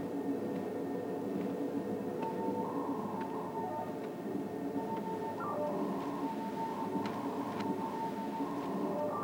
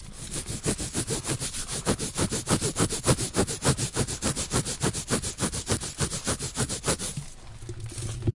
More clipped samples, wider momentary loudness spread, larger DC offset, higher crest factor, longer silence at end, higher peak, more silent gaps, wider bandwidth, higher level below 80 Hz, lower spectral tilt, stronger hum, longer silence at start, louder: neither; second, 3 LU vs 10 LU; neither; second, 14 dB vs 24 dB; about the same, 0 s vs 0.05 s; second, -24 dBFS vs -4 dBFS; neither; first, over 20 kHz vs 11.5 kHz; second, -74 dBFS vs -42 dBFS; first, -7 dB/octave vs -3.5 dB/octave; neither; about the same, 0 s vs 0 s; second, -38 LUFS vs -28 LUFS